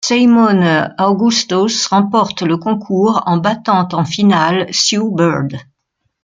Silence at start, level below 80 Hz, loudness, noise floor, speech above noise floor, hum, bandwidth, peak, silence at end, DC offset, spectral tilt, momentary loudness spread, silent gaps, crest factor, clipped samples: 0 s; -56 dBFS; -13 LUFS; -69 dBFS; 56 dB; none; 9.4 kHz; 0 dBFS; 0.6 s; under 0.1%; -4.5 dB/octave; 6 LU; none; 12 dB; under 0.1%